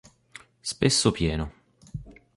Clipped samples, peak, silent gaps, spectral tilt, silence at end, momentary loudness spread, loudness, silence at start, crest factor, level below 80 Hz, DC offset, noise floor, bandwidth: under 0.1%; -6 dBFS; none; -4 dB/octave; 0.25 s; 20 LU; -25 LUFS; 0.65 s; 22 dB; -42 dBFS; under 0.1%; -51 dBFS; 11.5 kHz